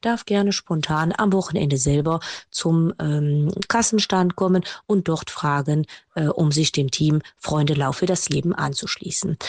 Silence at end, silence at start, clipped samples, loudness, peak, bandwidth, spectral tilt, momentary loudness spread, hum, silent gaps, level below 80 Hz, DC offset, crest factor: 0 s; 0.05 s; under 0.1%; -22 LUFS; -4 dBFS; 9.8 kHz; -5 dB/octave; 6 LU; none; none; -50 dBFS; under 0.1%; 16 dB